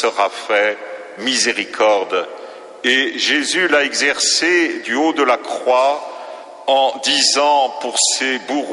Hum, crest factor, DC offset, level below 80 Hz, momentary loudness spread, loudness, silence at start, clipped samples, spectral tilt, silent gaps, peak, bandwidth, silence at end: none; 16 dB; under 0.1%; -66 dBFS; 12 LU; -16 LUFS; 0 s; under 0.1%; 0 dB/octave; none; -2 dBFS; 11.5 kHz; 0 s